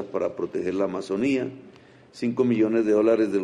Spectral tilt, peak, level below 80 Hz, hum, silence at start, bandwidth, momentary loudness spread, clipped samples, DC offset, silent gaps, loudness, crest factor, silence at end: -7 dB/octave; -8 dBFS; -66 dBFS; none; 0 s; 10.5 kHz; 9 LU; under 0.1%; under 0.1%; none; -24 LUFS; 16 dB; 0 s